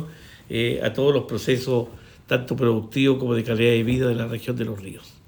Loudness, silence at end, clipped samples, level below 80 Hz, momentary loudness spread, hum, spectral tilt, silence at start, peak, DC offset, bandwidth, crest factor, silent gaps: -23 LUFS; 0.15 s; under 0.1%; -52 dBFS; 10 LU; none; -6.5 dB/octave; 0 s; -6 dBFS; under 0.1%; over 20 kHz; 16 dB; none